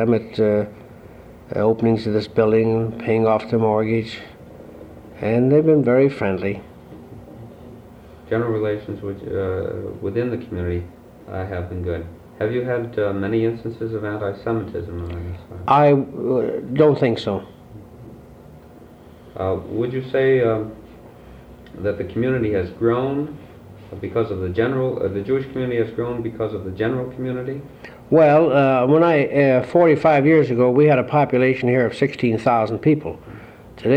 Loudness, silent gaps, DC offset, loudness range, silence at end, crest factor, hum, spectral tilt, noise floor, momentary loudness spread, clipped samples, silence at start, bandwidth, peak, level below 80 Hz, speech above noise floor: -20 LUFS; none; under 0.1%; 10 LU; 0 s; 16 dB; none; -9 dB/octave; -43 dBFS; 18 LU; under 0.1%; 0 s; 8.8 kHz; -4 dBFS; -48 dBFS; 25 dB